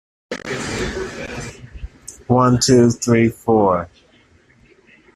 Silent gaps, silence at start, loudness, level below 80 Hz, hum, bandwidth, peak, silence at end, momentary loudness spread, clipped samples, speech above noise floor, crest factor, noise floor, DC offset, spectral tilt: none; 0.3 s; -17 LUFS; -42 dBFS; none; 13.5 kHz; -2 dBFS; 1.3 s; 23 LU; under 0.1%; 37 dB; 18 dB; -53 dBFS; under 0.1%; -5.5 dB/octave